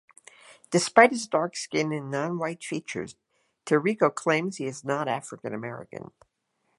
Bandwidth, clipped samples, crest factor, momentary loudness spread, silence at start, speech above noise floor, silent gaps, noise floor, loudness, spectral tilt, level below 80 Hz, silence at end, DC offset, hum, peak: 11.5 kHz; under 0.1%; 26 dB; 17 LU; 0.5 s; 49 dB; none; -75 dBFS; -26 LUFS; -4.5 dB/octave; -72 dBFS; 0.75 s; under 0.1%; none; 0 dBFS